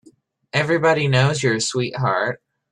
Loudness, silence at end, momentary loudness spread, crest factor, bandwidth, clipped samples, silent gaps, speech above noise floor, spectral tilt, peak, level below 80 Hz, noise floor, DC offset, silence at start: -19 LUFS; 0.35 s; 8 LU; 16 dB; 11 kHz; under 0.1%; none; 35 dB; -5 dB/octave; -4 dBFS; -56 dBFS; -54 dBFS; under 0.1%; 0.55 s